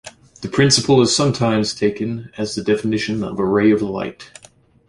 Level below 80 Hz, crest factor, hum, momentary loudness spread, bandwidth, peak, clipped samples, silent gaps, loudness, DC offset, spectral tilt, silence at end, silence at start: -50 dBFS; 18 dB; none; 12 LU; 11.5 kHz; 0 dBFS; under 0.1%; none; -18 LUFS; under 0.1%; -4.5 dB/octave; 0.65 s; 0.05 s